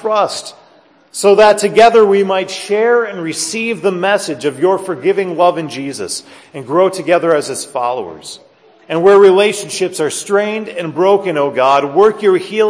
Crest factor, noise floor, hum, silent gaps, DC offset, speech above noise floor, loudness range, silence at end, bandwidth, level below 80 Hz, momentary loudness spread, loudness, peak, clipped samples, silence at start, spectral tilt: 14 dB; -47 dBFS; none; none; under 0.1%; 35 dB; 4 LU; 0 s; 11 kHz; -58 dBFS; 14 LU; -13 LUFS; 0 dBFS; under 0.1%; 0 s; -4 dB/octave